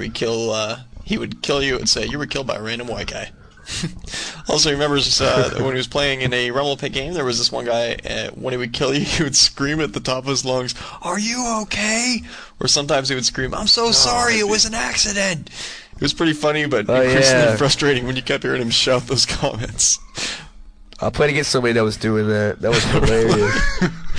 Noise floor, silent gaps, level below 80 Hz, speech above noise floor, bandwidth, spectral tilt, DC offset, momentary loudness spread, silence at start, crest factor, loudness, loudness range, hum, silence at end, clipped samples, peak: -40 dBFS; none; -34 dBFS; 21 dB; 11 kHz; -3 dB/octave; under 0.1%; 12 LU; 0 s; 16 dB; -18 LUFS; 5 LU; none; 0 s; under 0.1%; -4 dBFS